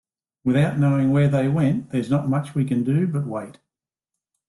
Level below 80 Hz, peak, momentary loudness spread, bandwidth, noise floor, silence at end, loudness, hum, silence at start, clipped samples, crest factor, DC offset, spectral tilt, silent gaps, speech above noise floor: -58 dBFS; -8 dBFS; 9 LU; 11.5 kHz; -86 dBFS; 0.95 s; -21 LUFS; none; 0.45 s; under 0.1%; 14 dB; under 0.1%; -8.5 dB/octave; none; 66 dB